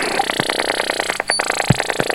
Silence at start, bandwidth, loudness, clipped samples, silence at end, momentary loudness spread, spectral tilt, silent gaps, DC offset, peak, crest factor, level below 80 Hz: 0 s; 17 kHz; -18 LUFS; under 0.1%; 0 s; 2 LU; -3 dB/octave; none; under 0.1%; 0 dBFS; 20 dB; -44 dBFS